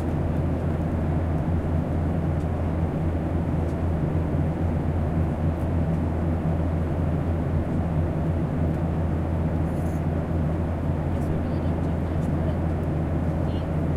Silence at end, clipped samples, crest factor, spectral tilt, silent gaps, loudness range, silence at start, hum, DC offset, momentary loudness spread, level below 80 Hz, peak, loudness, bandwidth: 0 s; under 0.1%; 12 dB; -9.5 dB/octave; none; 1 LU; 0 s; none; under 0.1%; 1 LU; -32 dBFS; -12 dBFS; -26 LUFS; 4.9 kHz